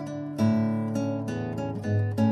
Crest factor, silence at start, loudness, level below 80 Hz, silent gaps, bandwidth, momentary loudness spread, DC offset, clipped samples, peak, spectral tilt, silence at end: 14 dB; 0 s; -28 LUFS; -60 dBFS; none; 12.5 kHz; 7 LU; under 0.1%; under 0.1%; -12 dBFS; -8.5 dB/octave; 0 s